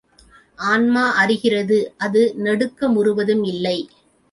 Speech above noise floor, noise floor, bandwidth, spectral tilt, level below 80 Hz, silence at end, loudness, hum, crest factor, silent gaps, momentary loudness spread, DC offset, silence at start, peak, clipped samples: 33 dB; -51 dBFS; 11.5 kHz; -5.5 dB/octave; -60 dBFS; 0.45 s; -18 LUFS; none; 16 dB; none; 7 LU; under 0.1%; 0.6 s; -4 dBFS; under 0.1%